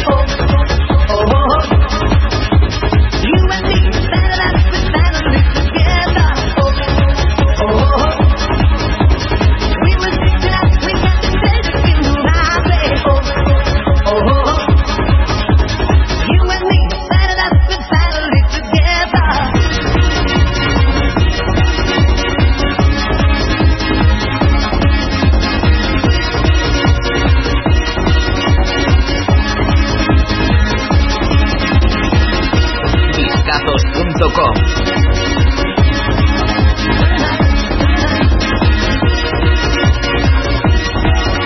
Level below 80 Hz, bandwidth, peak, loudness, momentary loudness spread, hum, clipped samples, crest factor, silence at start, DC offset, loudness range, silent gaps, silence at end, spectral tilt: -14 dBFS; 6.2 kHz; 0 dBFS; -13 LUFS; 2 LU; none; under 0.1%; 12 dB; 0 s; under 0.1%; 1 LU; none; 0 s; -6 dB/octave